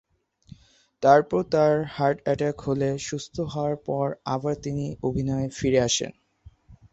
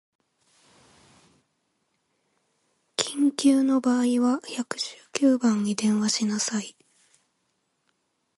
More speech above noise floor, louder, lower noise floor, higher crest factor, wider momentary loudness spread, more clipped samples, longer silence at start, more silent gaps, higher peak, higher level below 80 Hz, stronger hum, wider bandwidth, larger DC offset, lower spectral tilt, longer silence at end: second, 29 dB vs 51 dB; about the same, -25 LUFS vs -24 LUFS; second, -53 dBFS vs -74 dBFS; about the same, 22 dB vs 24 dB; about the same, 11 LU vs 11 LU; neither; second, 1 s vs 3 s; neither; about the same, -4 dBFS vs -4 dBFS; first, -52 dBFS vs -76 dBFS; neither; second, 8.2 kHz vs 11.5 kHz; neither; about the same, -5 dB/octave vs -4 dB/octave; second, 0.2 s vs 1.65 s